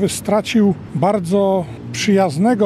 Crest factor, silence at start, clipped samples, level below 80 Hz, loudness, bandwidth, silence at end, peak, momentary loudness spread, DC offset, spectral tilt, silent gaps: 14 dB; 0 s; under 0.1%; -50 dBFS; -17 LUFS; 14 kHz; 0 s; -2 dBFS; 6 LU; under 0.1%; -6 dB/octave; none